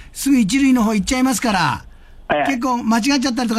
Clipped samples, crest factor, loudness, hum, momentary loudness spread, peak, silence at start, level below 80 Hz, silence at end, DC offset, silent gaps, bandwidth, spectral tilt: under 0.1%; 14 dB; -17 LUFS; none; 5 LU; -4 dBFS; 0 s; -40 dBFS; 0 s; under 0.1%; none; 15.5 kHz; -4 dB/octave